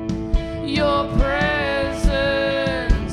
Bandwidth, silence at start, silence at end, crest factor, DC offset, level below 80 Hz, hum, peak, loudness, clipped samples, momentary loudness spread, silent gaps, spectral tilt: 11.5 kHz; 0 s; 0 s; 18 dB; under 0.1%; -24 dBFS; none; -2 dBFS; -21 LUFS; under 0.1%; 5 LU; none; -6 dB/octave